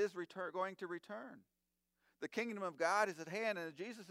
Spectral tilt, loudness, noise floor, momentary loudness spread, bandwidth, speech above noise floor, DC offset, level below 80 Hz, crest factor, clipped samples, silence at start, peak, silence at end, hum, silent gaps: -4 dB/octave; -42 LUFS; -85 dBFS; 15 LU; 16 kHz; 43 dB; under 0.1%; under -90 dBFS; 22 dB; under 0.1%; 0 s; -22 dBFS; 0 s; none; none